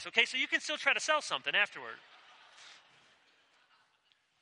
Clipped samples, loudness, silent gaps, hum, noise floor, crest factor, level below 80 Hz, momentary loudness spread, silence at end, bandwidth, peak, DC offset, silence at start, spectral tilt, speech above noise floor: under 0.1%; -30 LUFS; none; none; -73 dBFS; 26 dB; under -90 dBFS; 19 LU; 1.65 s; 11 kHz; -10 dBFS; under 0.1%; 0 s; 0 dB/octave; 40 dB